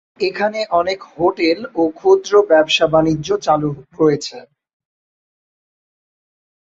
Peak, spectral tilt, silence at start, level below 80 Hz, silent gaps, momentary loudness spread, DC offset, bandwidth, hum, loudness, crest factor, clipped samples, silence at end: -2 dBFS; -5 dB/octave; 0.2 s; -52 dBFS; none; 9 LU; under 0.1%; 7.8 kHz; none; -16 LUFS; 16 dB; under 0.1%; 2.3 s